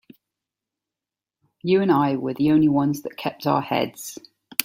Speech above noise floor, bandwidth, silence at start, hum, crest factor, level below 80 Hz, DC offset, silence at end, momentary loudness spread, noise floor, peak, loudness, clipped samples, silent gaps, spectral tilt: 68 dB; 16.5 kHz; 1.65 s; none; 24 dB; -60 dBFS; under 0.1%; 0 s; 14 LU; -89 dBFS; 0 dBFS; -22 LUFS; under 0.1%; none; -5.5 dB/octave